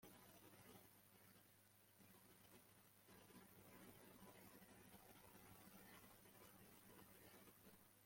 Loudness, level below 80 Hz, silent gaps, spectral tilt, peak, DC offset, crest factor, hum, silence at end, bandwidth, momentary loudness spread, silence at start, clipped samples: -66 LUFS; -86 dBFS; none; -3.5 dB/octave; -50 dBFS; under 0.1%; 18 dB; none; 0 s; 16.5 kHz; 4 LU; 0 s; under 0.1%